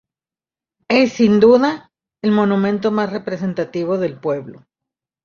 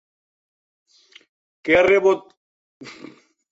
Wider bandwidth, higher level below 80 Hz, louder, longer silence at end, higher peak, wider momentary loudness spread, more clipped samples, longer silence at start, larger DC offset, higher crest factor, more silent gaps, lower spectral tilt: about the same, 7.2 kHz vs 7.8 kHz; about the same, -58 dBFS vs -56 dBFS; about the same, -17 LUFS vs -17 LUFS; about the same, 0.65 s vs 0.6 s; about the same, -2 dBFS vs -4 dBFS; second, 11 LU vs 25 LU; neither; second, 0.9 s vs 1.65 s; neither; about the same, 16 dB vs 20 dB; second, none vs 2.37-2.80 s; first, -7 dB/octave vs -5 dB/octave